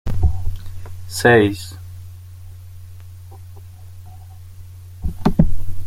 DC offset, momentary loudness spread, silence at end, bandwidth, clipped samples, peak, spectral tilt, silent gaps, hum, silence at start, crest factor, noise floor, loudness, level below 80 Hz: under 0.1%; 25 LU; 0 s; 15.5 kHz; under 0.1%; -2 dBFS; -6 dB/octave; none; none; 0.05 s; 18 dB; -37 dBFS; -19 LUFS; -28 dBFS